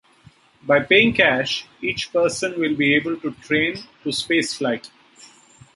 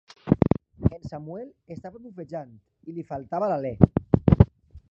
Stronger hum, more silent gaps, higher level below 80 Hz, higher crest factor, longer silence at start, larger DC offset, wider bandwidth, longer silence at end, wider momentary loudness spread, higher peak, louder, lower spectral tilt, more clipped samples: neither; neither; second, -56 dBFS vs -36 dBFS; about the same, 20 dB vs 24 dB; first, 0.65 s vs 0.25 s; neither; first, 11.5 kHz vs 6.2 kHz; first, 0.9 s vs 0.15 s; second, 12 LU vs 21 LU; about the same, -2 dBFS vs 0 dBFS; first, -20 LUFS vs -23 LUFS; second, -4 dB/octave vs -11 dB/octave; neither